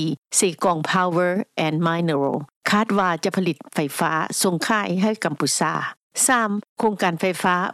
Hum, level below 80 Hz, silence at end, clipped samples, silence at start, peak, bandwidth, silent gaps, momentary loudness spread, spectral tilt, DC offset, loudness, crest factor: none; -68 dBFS; 0 s; under 0.1%; 0 s; -6 dBFS; 15 kHz; 0.18-0.22 s, 2.56-2.61 s, 5.97-6.10 s, 6.69-6.76 s; 6 LU; -4 dB/octave; under 0.1%; -21 LUFS; 16 dB